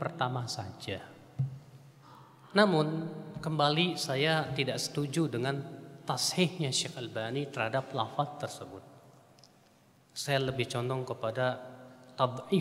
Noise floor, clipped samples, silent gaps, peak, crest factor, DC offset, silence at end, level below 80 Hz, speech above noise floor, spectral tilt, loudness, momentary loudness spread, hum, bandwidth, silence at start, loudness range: -63 dBFS; under 0.1%; none; -8 dBFS; 24 dB; under 0.1%; 0 s; -70 dBFS; 31 dB; -4.5 dB/octave; -32 LUFS; 15 LU; none; 16 kHz; 0 s; 6 LU